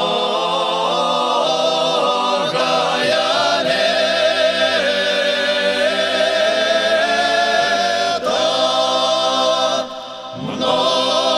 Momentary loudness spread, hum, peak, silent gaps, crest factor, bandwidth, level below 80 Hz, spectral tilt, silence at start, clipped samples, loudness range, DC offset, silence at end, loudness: 3 LU; none; -4 dBFS; none; 14 dB; 13 kHz; -62 dBFS; -2 dB/octave; 0 s; under 0.1%; 1 LU; under 0.1%; 0 s; -16 LUFS